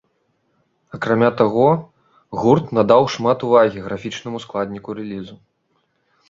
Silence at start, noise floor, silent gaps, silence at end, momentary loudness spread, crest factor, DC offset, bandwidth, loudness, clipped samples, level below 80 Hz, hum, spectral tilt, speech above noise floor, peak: 0.95 s; -67 dBFS; none; 0.95 s; 15 LU; 18 dB; under 0.1%; 7.6 kHz; -18 LUFS; under 0.1%; -56 dBFS; none; -7 dB/octave; 49 dB; -2 dBFS